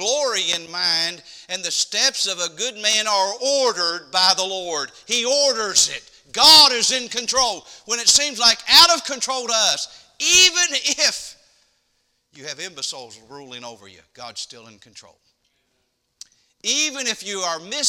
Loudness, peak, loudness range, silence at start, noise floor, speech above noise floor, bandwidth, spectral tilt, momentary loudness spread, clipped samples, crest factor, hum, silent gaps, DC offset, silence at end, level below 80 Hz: -16 LUFS; 0 dBFS; 20 LU; 0 s; -70 dBFS; 50 dB; 18 kHz; 1 dB/octave; 21 LU; under 0.1%; 20 dB; none; none; under 0.1%; 0 s; -58 dBFS